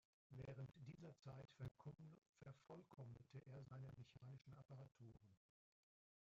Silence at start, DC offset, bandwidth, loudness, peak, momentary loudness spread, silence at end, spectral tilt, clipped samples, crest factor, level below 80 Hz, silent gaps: 0.3 s; under 0.1%; 7.4 kHz; -62 LUFS; -44 dBFS; 8 LU; 0.85 s; -7.5 dB/octave; under 0.1%; 18 dB; -82 dBFS; 2.29-2.33 s